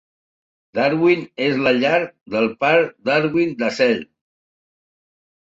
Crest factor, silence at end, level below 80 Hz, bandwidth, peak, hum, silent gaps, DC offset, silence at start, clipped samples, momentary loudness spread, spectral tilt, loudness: 18 dB; 1.45 s; -62 dBFS; 7.8 kHz; -2 dBFS; none; 2.21-2.26 s; under 0.1%; 0.75 s; under 0.1%; 5 LU; -6 dB/octave; -19 LUFS